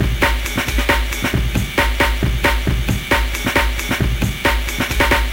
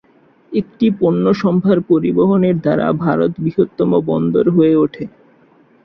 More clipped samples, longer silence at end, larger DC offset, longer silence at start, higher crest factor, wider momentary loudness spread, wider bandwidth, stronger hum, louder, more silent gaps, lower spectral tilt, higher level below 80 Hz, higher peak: neither; second, 0 s vs 0.8 s; first, 0.2% vs under 0.1%; second, 0 s vs 0.5 s; about the same, 16 dB vs 14 dB; second, 3 LU vs 8 LU; first, 17 kHz vs 6 kHz; neither; second, -18 LUFS vs -15 LUFS; neither; second, -4.5 dB/octave vs -10 dB/octave; first, -20 dBFS vs -52 dBFS; about the same, -2 dBFS vs -2 dBFS